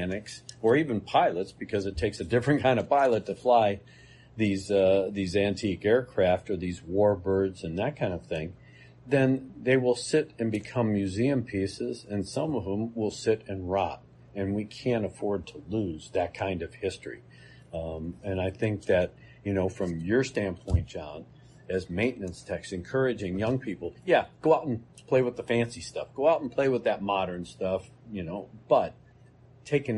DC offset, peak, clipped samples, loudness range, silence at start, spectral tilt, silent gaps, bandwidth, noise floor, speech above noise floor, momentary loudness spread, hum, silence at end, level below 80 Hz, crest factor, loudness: under 0.1%; -8 dBFS; under 0.1%; 6 LU; 0 s; -6.5 dB/octave; none; 11.5 kHz; -55 dBFS; 28 dB; 12 LU; none; 0 s; -50 dBFS; 20 dB; -28 LUFS